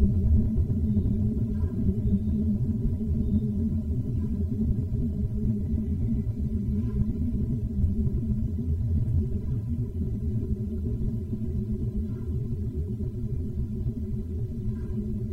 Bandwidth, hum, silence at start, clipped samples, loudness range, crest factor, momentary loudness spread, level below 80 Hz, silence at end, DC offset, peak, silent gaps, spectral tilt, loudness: 2.3 kHz; none; 0 s; under 0.1%; 4 LU; 16 dB; 6 LU; -32 dBFS; 0 s; under 0.1%; -10 dBFS; none; -11.5 dB/octave; -29 LUFS